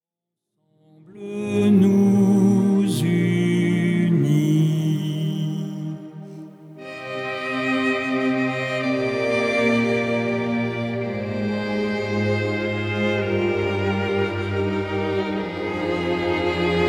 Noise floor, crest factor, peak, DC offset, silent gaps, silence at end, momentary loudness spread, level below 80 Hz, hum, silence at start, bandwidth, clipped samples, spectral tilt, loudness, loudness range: -85 dBFS; 14 dB; -6 dBFS; under 0.1%; none; 0 s; 12 LU; -54 dBFS; none; 1.1 s; 16 kHz; under 0.1%; -7 dB/octave; -21 LUFS; 6 LU